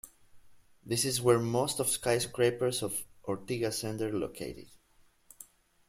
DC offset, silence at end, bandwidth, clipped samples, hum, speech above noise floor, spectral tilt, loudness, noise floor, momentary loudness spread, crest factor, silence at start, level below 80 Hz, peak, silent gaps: under 0.1%; 0.45 s; 16.5 kHz; under 0.1%; none; 34 dB; -4 dB/octave; -31 LUFS; -65 dBFS; 21 LU; 20 dB; 0.05 s; -64 dBFS; -12 dBFS; none